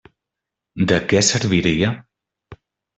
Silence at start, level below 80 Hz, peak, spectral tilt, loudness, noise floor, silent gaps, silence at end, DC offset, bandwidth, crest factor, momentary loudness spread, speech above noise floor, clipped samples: 0.75 s; -48 dBFS; -2 dBFS; -4 dB/octave; -18 LUFS; -84 dBFS; none; 0.45 s; under 0.1%; 8.4 kHz; 18 dB; 13 LU; 67 dB; under 0.1%